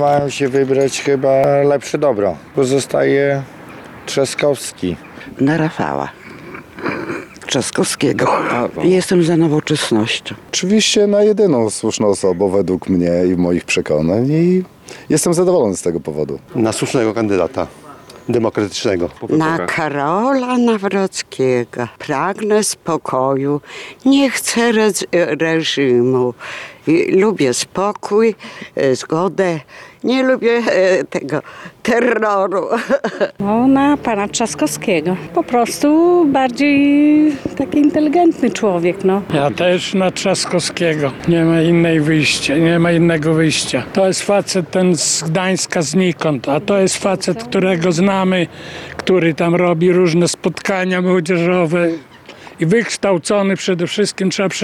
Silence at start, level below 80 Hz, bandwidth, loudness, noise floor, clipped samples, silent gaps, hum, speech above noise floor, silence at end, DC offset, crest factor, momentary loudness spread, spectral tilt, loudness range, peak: 0 s; -50 dBFS; 14.5 kHz; -15 LUFS; -37 dBFS; under 0.1%; none; none; 23 dB; 0 s; under 0.1%; 10 dB; 9 LU; -5 dB/octave; 4 LU; -4 dBFS